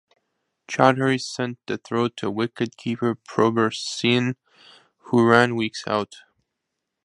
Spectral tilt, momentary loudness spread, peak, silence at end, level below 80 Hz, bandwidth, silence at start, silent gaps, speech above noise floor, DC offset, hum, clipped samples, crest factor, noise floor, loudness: -5.5 dB/octave; 11 LU; 0 dBFS; 0.85 s; -64 dBFS; 11 kHz; 0.7 s; none; 59 dB; under 0.1%; none; under 0.1%; 24 dB; -81 dBFS; -22 LUFS